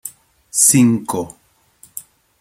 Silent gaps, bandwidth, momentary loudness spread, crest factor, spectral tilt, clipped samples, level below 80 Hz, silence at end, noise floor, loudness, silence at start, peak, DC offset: none; 16.5 kHz; 24 LU; 18 dB; -4 dB/octave; under 0.1%; -60 dBFS; 0.4 s; -51 dBFS; -14 LUFS; 0.05 s; 0 dBFS; under 0.1%